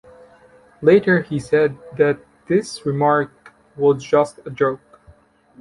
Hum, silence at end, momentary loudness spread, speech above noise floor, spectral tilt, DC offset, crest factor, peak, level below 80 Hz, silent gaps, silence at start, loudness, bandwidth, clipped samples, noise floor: none; 0.85 s; 10 LU; 34 dB; -6.5 dB/octave; under 0.1%; 18 dB; -2 dBFS; -56 dBFS; none; 0.8 s; -19 LUFS; 11.5 kHz; under 0.1%; -51 dBFS